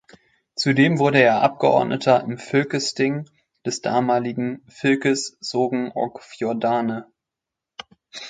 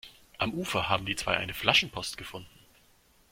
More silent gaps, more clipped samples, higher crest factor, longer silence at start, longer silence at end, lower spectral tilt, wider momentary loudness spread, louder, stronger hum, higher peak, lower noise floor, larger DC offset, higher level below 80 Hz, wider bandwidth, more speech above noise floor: neither; neither; second, 22 dB vs 28 dB; first, 0.55 s vs 0.05 s; second, 0 s vs 0.85 s; first, -5 dB/octave vs -3 dB/octave; second, 15 LU vs 18 LU; first, -21 LUFS vs -28 LUFS; neither; first, 0 dBFS vs -4 dBFS; first, -86 dBFS vs -63 dBFS; neither; second, -66 dBFS vs -56 dBFS; second, 9.4 kHz vs 16.5 kHz; first, 65 dB vs 33 dB